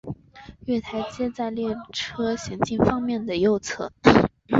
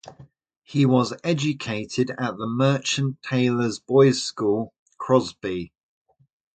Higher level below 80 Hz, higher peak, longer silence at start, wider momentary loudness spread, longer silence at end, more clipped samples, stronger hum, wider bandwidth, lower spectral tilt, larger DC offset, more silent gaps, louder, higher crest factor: first, -48 dBFS vs -60 dBFS; about the same, -2 dBFS vs -4 dBFS; about the same, 0.05 s vs 0.05 s; about the same, 13 LU vs 11 LU; second, 0 s vs 0.85 s; neither; neither; second, 7.8 kHz vs 9.2 kHz; about the same, -5.5 dB/octave vs -5.5 dB/octave; neither; second, none vs 0.57-0.62 s, 4.79-4.86 s; about the same, -24 LUFS vs -23 LUFS; about the same, 22 dB vs 20 dB